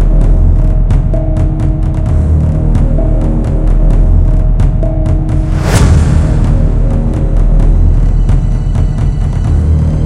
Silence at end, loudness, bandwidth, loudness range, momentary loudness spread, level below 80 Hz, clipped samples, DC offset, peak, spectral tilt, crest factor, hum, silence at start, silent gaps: 0 s; -12 LUFS; 10.5 kHz; 1 LU; 3 LU; -10 dBFS; 0.3%; under 0.1%; 0 dBFS; -8 dB/octave; 8 dB; none; 0 s; none